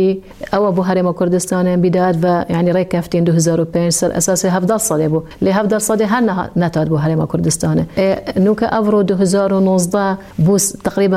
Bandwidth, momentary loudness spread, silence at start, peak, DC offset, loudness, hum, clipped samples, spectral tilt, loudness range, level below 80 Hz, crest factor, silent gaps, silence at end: 15.5 kHz; 3 LU; 0 s; -2 dBFS; under 0.1%; -15 LUFS; none; under 0.1%; -5.5 dB/octave; 1 LU; -44 dBFS; 12 dB; none; 0 s